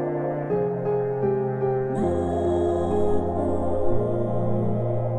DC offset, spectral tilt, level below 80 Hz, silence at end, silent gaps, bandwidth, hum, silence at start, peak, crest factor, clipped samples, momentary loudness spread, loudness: under 0.1%; -9.5 dB/octave; -42 dBFS; 0 s; none; 10 kHz; none; 0 s; -10 dBFS; 14 dB; under 0.1%; 2 LU; -25 LUFS